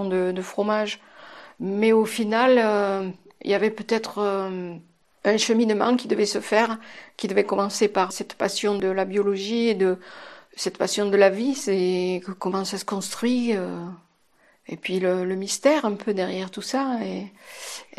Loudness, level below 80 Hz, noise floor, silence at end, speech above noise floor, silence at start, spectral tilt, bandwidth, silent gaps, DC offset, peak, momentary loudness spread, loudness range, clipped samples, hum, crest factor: -23 LUFS; -72 dBFS; -61 dBFS; 0.15 s; 38 dB; 0 s; -4.5 dB/octave; 13 kHz; none; under 0.1%; -4 dBFS; 15 LU; 4 LU; under 0.1%; none; 20 dB